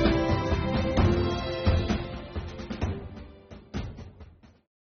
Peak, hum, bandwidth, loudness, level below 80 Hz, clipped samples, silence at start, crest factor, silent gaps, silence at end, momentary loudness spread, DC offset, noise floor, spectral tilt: -10 dBFS; none; 6.6 kHz; -29 LUFS; -36 dBFS; under 0.1%; 0 s; 18 dB; none; 0.65 s; 21 LU; under 0.1%; -51 dBFS; -6 dB/octave